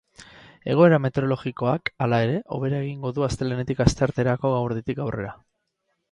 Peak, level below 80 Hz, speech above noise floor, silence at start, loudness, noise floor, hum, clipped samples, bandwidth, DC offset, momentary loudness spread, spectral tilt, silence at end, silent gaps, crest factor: 0 dBFS; -44 dBFS; 53 dB; 0.2 s; -23 LUFS; -75 dBFS; none; under 0.1%; 11 kHz; under 0.1%; 11 LU; -7 dB/octave; 0.8 s; none; 22 dB